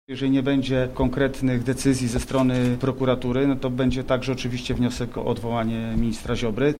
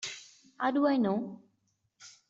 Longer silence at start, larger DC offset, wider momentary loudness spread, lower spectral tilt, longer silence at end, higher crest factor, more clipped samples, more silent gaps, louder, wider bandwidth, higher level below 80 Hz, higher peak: about the same, 0.1 s vs 0 s; neither; second, 5 LU vs 16 LU; first, -6.5 dB/octave vs -5 dB/octave; second, 0 s vs 0.2 s; about the same, 14 dB vs 18 dB; neither; neither; first, -24 LUFS vs -30 LUFS; first, 15.5 kHz vs 8 kHz; first, -36 dBFS vs -78 dBFS; first, -8 dBFS vs -16 dBFS